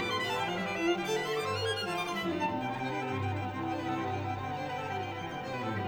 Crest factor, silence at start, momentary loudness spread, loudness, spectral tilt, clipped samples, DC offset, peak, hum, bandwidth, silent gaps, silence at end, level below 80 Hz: 14 dB; 0 s; 5 LU; -34 LUFS; -5 dB/octave; under 0.1%; under 0.1%; -20 dBFS; none; over 20 kHz; none; 0 s; -64 dBFS